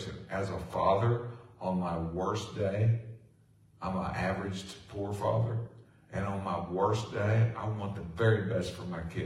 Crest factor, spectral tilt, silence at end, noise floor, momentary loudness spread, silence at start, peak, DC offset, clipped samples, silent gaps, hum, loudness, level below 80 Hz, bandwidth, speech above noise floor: 18 dB; -7 dB/octave; 0 s; -62 dBFS; 11 LU; 0 s; -14 dBFS; under 0.1%; under 0.1%; none; none; -33 LUFS; -58 dBFS; 11.5 kHz; 31 dB